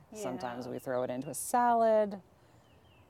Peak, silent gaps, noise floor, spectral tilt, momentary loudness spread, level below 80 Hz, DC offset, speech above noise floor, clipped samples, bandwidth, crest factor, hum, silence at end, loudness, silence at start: -18 dBFS; none; -62 dBFS; -4.5 dB/octave; 13 LU; -74 dBFS; under 0.1%; 30 dB; under 0.1%; 16.5 kHz; 16 dB; none; 0.9 s; -32 LUFS; 0.1 s